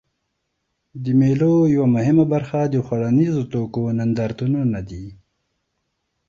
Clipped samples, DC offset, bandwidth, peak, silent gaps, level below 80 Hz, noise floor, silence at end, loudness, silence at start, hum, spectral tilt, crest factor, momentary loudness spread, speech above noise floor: under 0.1%; under 0.1%; 7.2 kHz; -6 dBFS; none; -50 dBFS; -74 dBFS; 1.15 s; -19 LUFS; 0.95 s; none; -9.5 dB/octave; 14 dB; 11 LU; 56 dB